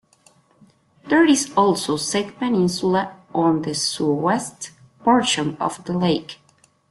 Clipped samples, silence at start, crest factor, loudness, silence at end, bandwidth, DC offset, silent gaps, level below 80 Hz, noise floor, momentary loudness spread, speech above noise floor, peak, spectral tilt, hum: under 0.1%; 1.05 s; 18 dB; -20 LUFS; 0.55 s; 12.5 kHz; under 0.1%; none; -60 dBFS; -58 dBFS; 9 LU; 39 dB; -4 dBFS; -4.5 dB/octave; none